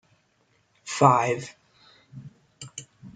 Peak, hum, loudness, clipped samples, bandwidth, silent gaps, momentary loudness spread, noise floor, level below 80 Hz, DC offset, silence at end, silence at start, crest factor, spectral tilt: -4 dBFS; none; -22 LUFS; under 0.1%; 9.6 kHz; none; 27 LU; -67 dBFS; -70 dBFS; under 0.1%; 0.05 s; 0.85 s; 24 dB; -5 dB/octave